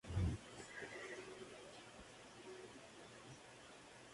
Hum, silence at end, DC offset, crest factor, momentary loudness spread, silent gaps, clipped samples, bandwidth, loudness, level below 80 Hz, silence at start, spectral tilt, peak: none; 0 s; under 0.1%; 22 dB; 14 LU; none; under 0.1%; 11.5 kHz; -52 LUFS; -56 dBFS; 0.05 s; -5.5 dB/octave; -28 dBFS